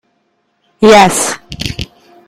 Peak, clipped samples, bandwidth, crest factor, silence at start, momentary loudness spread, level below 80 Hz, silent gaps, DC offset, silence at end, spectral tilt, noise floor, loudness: 0 dBFS; 2%; 17 kHz; 12 dB; 0.8 s; 18 LU; -36 dBFS; none; under 0.1%; 0.4 s; -3.5 dB/octave; -61 dBFS; -10 LUFS